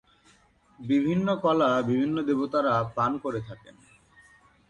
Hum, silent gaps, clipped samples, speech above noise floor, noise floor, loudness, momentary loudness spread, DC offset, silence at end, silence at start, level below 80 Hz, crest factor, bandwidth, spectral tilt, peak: none; none; under 0.1%; 35 dB; -61 dBFS; -26 LUFS; 13 LU; under 0.1%; 1.15 s; 0.8 s; -62 dBFS; 16 dB; 9.4 kHz; -7.5 dB/octave; -12 dBFS